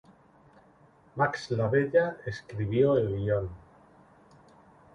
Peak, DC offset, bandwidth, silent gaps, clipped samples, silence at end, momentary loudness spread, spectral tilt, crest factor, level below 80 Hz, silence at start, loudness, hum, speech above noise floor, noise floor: -12 dBFS; under 0.1%; 9.8 kHz; none; under 0.1%; 1.35 s; 14 LU; -7.5 dB/octave; 18 dB; -54 dBFS; 1.15 s; -28 LUFS; none; 32 dB; -59 dBFS